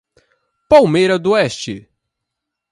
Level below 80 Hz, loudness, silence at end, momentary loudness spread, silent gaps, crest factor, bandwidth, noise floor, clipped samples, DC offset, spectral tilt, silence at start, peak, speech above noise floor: -50 dBFS; -13 LUFS; 0.95 s; 17 LU; none; 16 dB; 11.5 kHz; -79 dBFS; under 0.1%; under 0.1%; -5.5 dB/octave; 0.7 s; 0 dBFS; 66 dB